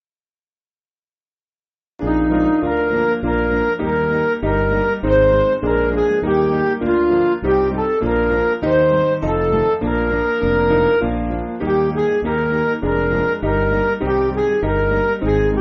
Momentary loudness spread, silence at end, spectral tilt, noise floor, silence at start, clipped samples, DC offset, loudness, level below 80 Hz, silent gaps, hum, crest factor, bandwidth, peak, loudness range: 4 LU; 0 s; -6.5 dB/octave; under -90 dBFS; 2 s; under 0.1%; under 0.1%; -18 LUFS; -30 dBFS; none; none; 16 dB; 6.2 kHz; -2 dBFS; 2 LU